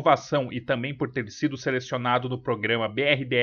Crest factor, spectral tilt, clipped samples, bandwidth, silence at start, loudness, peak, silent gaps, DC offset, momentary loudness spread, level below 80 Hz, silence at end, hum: 20 dB; -5.5 dB/octave; under 0.1%; 7.2 kHz; 0 s; -26 LUFS; -6 dBFS; none; under 0.1%; 7 LU; -62 dBFS; 0 s; none